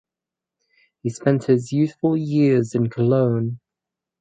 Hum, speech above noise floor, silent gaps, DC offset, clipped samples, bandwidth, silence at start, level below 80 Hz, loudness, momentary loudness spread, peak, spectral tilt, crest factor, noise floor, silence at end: none; 68 dB; none; under 0.1%; under 0.1%; 9.2 kHz; 1.05 s; -62 dBFS; -20 LUFS; 11 LU; -4 dBFS; -8.5 dB/octave; 16 dB; -87 dBFS; 0.65 s